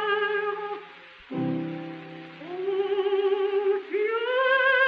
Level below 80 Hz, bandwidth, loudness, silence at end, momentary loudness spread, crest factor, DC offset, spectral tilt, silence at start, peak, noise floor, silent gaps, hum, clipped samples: -72 dBFS; 5.2 kHz; -26 LUFS; 0 s; 17 LU; 16 dB; under 0.1%; -7 dB/octave; 0 s; -10 dBFS; -47 dBFS; none; none; under 0.1%